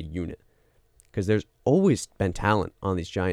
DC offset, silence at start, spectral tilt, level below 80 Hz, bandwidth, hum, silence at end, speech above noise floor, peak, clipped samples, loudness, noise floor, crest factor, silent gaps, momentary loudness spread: under 0.1%; 0 s; -6.5 dB/octave; -46 dBFS; 13.5 kHz; none; 0 s; 38 dB; -8 dBFS; under 0.1%; -26 LUFS; -63 dBFS; 18 dB; none; 14 LU